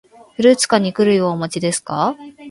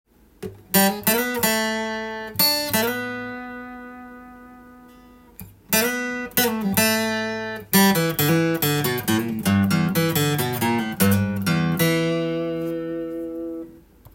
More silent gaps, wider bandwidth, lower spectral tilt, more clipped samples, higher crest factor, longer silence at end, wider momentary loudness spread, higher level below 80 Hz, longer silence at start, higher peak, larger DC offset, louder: neither; second, 11.5 kHz vs 17 kHz; about the same, -4.5 dB/octave vs -4 dB/octave; neither; about the same, 16 dB vs 20 dB; second, 0 s vs 0.35 s; second, 8 LU vs 15 LU; second, -60 dBFS vs -54 dBFS; about the same, 0.4 s vs 0.4 s; about the same, 0 dBFS vs -2 dBFS; neither; first, -16 LUFS vs -21 LUFS